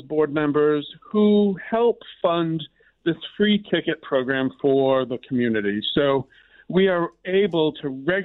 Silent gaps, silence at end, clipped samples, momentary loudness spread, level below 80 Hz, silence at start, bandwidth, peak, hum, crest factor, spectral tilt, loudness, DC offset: none; 0 s; under 0.1%; 7 LU; -60 dBFS; 0.05 s; 4.2 kHz; -8 dBFS; none; 14 dB; -9.5 dB/octave; -22 LUFS; under 0.1%